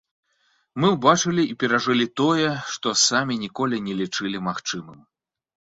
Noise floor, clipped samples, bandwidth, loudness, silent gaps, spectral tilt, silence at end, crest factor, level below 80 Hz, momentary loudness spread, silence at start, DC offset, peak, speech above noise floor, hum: -67 dBFS; under 0.1%; 8 kHz; -22 LUFS; none; -3.5 dB/octave; 0.8 s; 20 dB; -62 dBFS; 9 LU; 0.75 s; under 0.1%; -2 dBFS; 45 dB; none